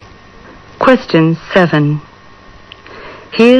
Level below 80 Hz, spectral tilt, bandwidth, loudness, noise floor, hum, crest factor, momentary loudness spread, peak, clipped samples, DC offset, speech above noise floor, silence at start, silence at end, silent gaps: -44 dBFS; -7.5 dB/octave; 9.6 kHz; -12 LUFS; -38 dBFS; none; 14 dB; 22 LU; 0 dBFS; 1%; under 0.1%; 29 dB; 0.8 s; 0 s; none